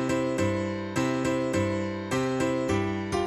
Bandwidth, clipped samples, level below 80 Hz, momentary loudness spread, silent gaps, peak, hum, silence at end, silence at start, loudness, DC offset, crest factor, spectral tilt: 14 kHz; under 0.1%; -52 dBFS; 3 LU; none; -14 dBFS; none; 0 s; 0 s; -28 LUFS; under 0.1%; 14 dB; -6 dB/octave